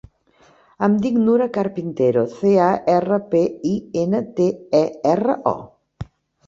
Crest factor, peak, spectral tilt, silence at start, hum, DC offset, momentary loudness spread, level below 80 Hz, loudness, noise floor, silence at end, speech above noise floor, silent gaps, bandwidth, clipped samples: 16 dB; -2 dBFS; -8 dB/octave; 0.8 s; none; under 0.1%; 8 LU; -52 dBFS; -19 LUFS; -55 dBFS; 0.45 s; 37 dB; none; 7.6 kHz; under 0.1%